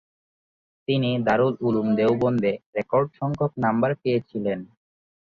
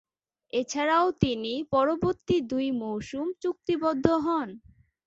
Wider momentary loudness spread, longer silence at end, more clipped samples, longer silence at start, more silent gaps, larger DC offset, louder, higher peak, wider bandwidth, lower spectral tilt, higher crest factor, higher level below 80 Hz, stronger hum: about the same, 7 LU vs 8 LU; about the same, 0.55 s vs 0.5 s; neither; first, 0.9 s vs 0.55 s; first, 2.66-2.73 s vs none; neither; first, -24 LUFS vs -27 LUFS; about the same, -6 dBFS vs -4 dBFS; second, 6.8 kHz vs 8 kHz; first, -8.5 dB/octave vs -5.5 dB/octave; second, 18 dB vs 24 dB; second, -60 dBFS vs -54 dBFS; neither